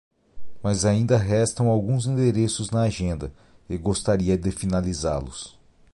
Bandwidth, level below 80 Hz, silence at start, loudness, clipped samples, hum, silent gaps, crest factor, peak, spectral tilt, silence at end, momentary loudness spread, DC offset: 11.5 kHz; -40 dBFS; 0.35 s; -23 LUFS; under 0.1%; none; none; 16 dB; -8 dBFS; -6 dB/octave; 0.45 s; 12 LU; under 0.1%